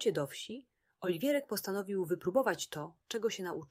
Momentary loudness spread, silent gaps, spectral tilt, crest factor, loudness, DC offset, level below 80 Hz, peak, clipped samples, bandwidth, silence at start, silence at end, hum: 11 LU; none; -4.5 dB/octave; 18 dB; -36 LUFS; under 0.1%; -78 dBFS; -18 dBFS; under 0.1%; 16 kHz; 0 s; 0.05 s; none